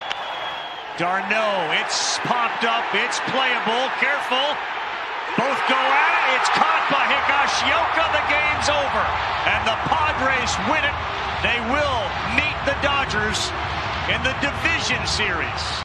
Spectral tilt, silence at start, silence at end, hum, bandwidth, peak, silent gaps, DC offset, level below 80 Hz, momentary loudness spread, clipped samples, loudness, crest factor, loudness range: -2.5 dB/octave; 0 s; 0 s; none; 13 kHz; -2 dBFS; none; under 0.1%; -42 dBFS; 7 LU; under 0.1%; -20 LUFS; 20 dB; 3 LU